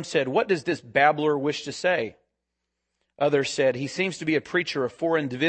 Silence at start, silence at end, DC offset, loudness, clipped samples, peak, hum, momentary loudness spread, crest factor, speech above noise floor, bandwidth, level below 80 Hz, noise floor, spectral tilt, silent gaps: 0 s; 0 s; under 0.1%; -25 LUFS; under 0.1%; -4 dBFS; none; 6 LU; 20 dB; 57 dB; 8.8 kHz; -68 dBFS; -82 dBFS; -4.5 dB/octave; none